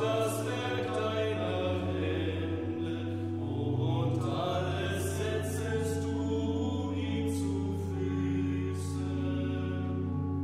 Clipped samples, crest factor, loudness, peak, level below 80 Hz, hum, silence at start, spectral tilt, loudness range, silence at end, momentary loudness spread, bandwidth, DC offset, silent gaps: under 0.1%; 14 dB; -32 LUFS; -18 dBFS; -66 dBFS; none; 0 s; -6.5 dB/octave; 1 LU; 0 s; 4 LU; 14.5 kHz; 0.1%; none